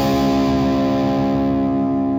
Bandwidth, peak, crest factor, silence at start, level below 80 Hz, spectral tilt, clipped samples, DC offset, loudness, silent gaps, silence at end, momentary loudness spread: 16 kHz; -8 dBFS; 8 dB; 0 s; -36 dBFS; -7 dB/octave; under 0.1%; under 0.1%; -18 LUFS; none; 0 s; 2 LU